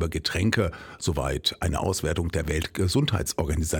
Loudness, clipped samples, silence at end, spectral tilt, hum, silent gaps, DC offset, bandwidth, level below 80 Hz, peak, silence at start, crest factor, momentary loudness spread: -26 LUFS; under 0.1%; 0 s; -4.5 dB/octave; none; none; under 0.1%; 18.5 kHz; -36 dBFS; -6 dBFS; 0 s; 20 dB; 4 LU